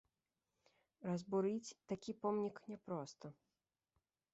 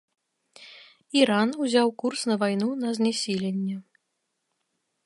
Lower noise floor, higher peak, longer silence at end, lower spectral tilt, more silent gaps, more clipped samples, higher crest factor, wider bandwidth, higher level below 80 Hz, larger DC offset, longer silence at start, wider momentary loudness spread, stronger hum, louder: first, under -90 dBFS vs -78 dBFS; second, -28 dBFS vs -6 dBFS; second, 1 s vs 1.25 s; first, -7 dB/octave vs -4.5 dB/octave; neither; neither; about the same, 18 dB vs 22 dB; second, 8 kHz vs 11.5 kHz; second, -84 dBFS vs -76 dBFS; neither; first, 1 s vs 0.6 s; first, 14 LU vs 11 LU; neither; second, -44 LUFS vs -25 LUFS